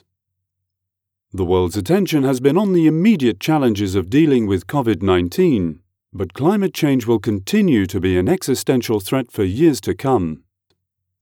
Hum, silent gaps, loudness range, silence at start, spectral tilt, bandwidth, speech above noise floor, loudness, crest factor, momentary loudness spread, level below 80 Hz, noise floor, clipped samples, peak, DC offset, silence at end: none; none; 2 LU; 1.35 s; -6.5 dB/octave; 18 kHz; 63 dB; -17 LUFS; 14 dB; 6 LU; -56 dBFS; -80 dBFS; under 0.1%; -2 dBFS; under 0.1%; 0.85 s